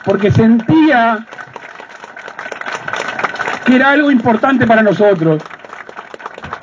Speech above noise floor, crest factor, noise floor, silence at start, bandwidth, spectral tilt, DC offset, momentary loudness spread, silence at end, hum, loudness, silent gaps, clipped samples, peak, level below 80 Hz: 23 dB; 14 dB; -33 dBFS; 0.05 s; 7.6 kHz; -7 dB/octave; under 0.1%; 21 LU; 0.05 s; none; -12 LUFS; none; under 0.1%; 0 dBFS; -48 dBFS